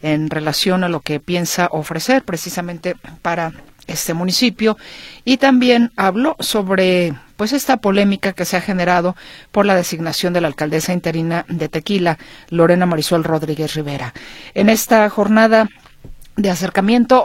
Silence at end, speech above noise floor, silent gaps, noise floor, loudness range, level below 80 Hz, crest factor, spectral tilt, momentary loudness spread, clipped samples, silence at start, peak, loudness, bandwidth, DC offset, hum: 0 s; 20 dB; none; -36 dBFS; 4 LU; -46 dBFS; 16 dB; -5 dB/octave; 12 LU; under 0.1%; 0.05 s; 0 dBFS; -16 LUFS; 16.5 kHz; under 0.1%; none